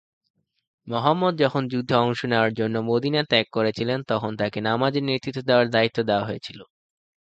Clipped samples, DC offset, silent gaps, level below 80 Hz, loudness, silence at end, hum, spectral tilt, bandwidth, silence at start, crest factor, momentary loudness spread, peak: under 0.1%; under 0.1%; none; -60 dBFS; -23 LUFS; 0.6 s; none; -6.5 dB/octave; 8.4 kHz; 0.85 s; 22 dB; 6 LU; -2 dBFS